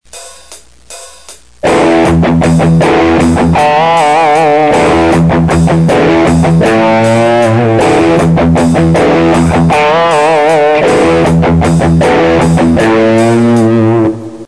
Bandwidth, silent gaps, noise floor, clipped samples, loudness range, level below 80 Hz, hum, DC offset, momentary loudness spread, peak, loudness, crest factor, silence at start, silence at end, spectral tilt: 11 kHz; none; -35 dBFS; under 0.1%; 1 LU; -26 dBFS; none; 1%; 1 LU; 0 dBFS; -7 LUFS; 8 dB; 0.15 s; 0 s; -6.5 dB/octave